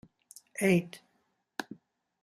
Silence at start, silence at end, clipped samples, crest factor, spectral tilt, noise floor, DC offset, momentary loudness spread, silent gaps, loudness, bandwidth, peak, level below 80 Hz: 0.55 s; 0.5 s; under 0.1%; 22 dB; -6 dB/octave; -76 dBFS; under 0.1%; 24 LU; none; -31 LUFS; 14.5 kHz; -12 dBFS; -72 dBFS